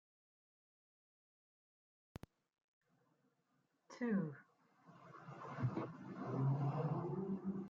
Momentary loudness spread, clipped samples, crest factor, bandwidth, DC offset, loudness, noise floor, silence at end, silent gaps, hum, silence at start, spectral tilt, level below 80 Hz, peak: 21 LU; under 0.1%; 18 dB; 7.2 kHz; under 0.1%; -43 LUFS; -82 dBFS; 0 s; none; none; 3.9 s; -9.5 dB/octave; -80 dBFS; -28 dBFS